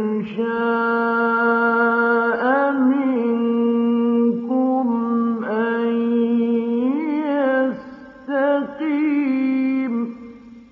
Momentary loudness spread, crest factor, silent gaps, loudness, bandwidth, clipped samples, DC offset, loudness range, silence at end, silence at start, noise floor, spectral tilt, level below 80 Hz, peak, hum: 6 LU; 14 dB; none; -19 LUFS; 4.9 kHz; under 0.1%; under 0.1%; 3 LU; 0.1 s; 0 s; -40 dBFS; -5 dB/octave; -66 dBFS; -6 dBFS; none